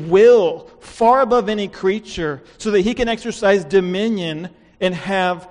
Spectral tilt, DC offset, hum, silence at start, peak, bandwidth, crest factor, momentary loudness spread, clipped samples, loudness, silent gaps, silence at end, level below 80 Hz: -5.5 dB/octave; under 0.1%; none; 0 s; -2 dBFS; 10.5 kHz; 16 dB; 13 LU; under 0.1%; -17 LUFS; none; 0.05 s; -44 dBFS